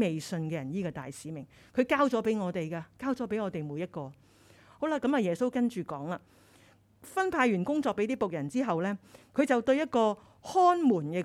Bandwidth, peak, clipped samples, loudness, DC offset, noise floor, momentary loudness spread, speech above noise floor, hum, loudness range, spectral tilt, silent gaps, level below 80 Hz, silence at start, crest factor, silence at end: 14.5 kHz; -12 dBFS; under 0.1%; -30 LUFS; under 0.1%; -61 dBFS; 13 LU; 31 dB; none; 5 LU; -6.5 dB/octave; none; -68 dBFS; 0 s; 18 dB; 0 s